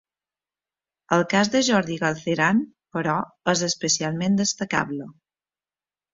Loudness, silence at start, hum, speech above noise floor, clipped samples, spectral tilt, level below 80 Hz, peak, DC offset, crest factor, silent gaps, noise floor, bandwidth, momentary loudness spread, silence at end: -23 LUFS; 1.1 s; 50 Hz at -45 dBFS; over 67 dB; under 0.1%; -4 dB/octave; -62 dBFS; -4 dBFS; under 0.1%; 20 dB; none; under -90 dBFS; 7.8 kHz; 8 LU; 1 s